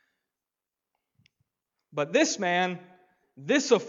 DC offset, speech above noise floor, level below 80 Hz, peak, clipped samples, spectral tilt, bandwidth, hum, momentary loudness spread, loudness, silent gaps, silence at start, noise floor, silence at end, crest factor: under 0.1%; 64 dB; -84 dBFS; -8 dBFS; under 0.1%; -3.5 dB/octave; 7.8 kHz; none; 16 LU; -26 LUFS; none; 1.95 s; -89 dBFS; 0 s; 22 dB